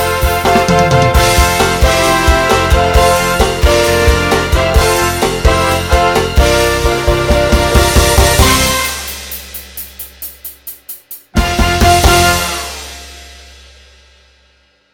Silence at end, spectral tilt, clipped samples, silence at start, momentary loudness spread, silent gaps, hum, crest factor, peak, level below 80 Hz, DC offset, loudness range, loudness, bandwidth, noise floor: 1.55 s; -4 dB/octave; 0.3%; 0 s; 17 LU; none; none; 12 dB; 0 dBFS; -18 dBFS; under 0.1%; 5 LU; -11 LUFS; 19 kHz; -52 dBFS